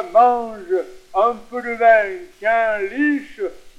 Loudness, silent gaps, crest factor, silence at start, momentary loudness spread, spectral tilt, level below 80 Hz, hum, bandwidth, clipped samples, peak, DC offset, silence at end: -19 LUFS; none; 16 dB; 0 s; 12 LU; -5 dB/octave; -52 dBFS; none; 9.6 kHz; under 0.1%; -2 dBFS; under 0.1%; 0.1 s